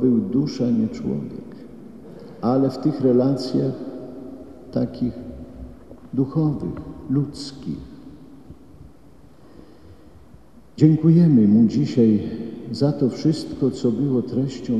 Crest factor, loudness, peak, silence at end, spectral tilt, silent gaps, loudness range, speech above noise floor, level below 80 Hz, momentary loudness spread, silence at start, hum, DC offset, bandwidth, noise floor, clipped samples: 20 dB; -21 LUFS; -2 dBFS; 0 s; -9 dB/octave; none; 13 LU; 30 dB; -50 dBFS; 24 LU; 0 s; none; 0.4%; 9.4 kHz; -49 dBFS; under 0.1%